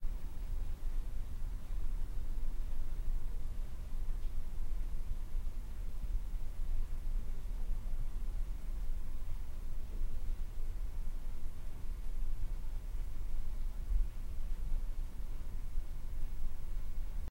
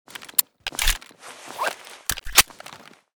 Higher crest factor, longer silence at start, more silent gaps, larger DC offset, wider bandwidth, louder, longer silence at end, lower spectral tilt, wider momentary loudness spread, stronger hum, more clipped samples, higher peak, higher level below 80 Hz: second, 12 dB vs 26 dB; second, 0 s vs 0.2 s; neither; neither; second, 3.9 kHz vs over 20 kHz; second, -46 LUFS vs -22 LUFS; second, 0 s vs 0.4 s; first, -6 dB/octave vs 0.5 dB/octave; second, 3 LU vs 24 LU; neither; neither; second, -20 dBFS vs 0 dBFS; about the same, -36 dBFS vs -36 dBFS